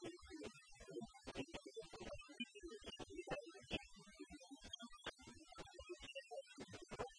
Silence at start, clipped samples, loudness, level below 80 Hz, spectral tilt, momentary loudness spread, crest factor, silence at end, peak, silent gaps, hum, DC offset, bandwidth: 0 s; under 0.1%; -54 LUFS; -68 dBFS; -3.5 dB/octave; 9 LU; 24 dB; 0 s; -32 dBFS; none; none; under 0.1%; 10.5 kHz